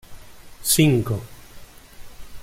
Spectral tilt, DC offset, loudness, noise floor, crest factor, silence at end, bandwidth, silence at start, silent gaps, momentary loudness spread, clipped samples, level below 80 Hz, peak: -4.5 dB/octave; under 0.1%; -20 LUFS; -42 dBFS; 20 dB; 0 s; 16.5 kHz; 0.1 s; none; 15 LU; under 0.1%; -44 dBFS; -4 dBFS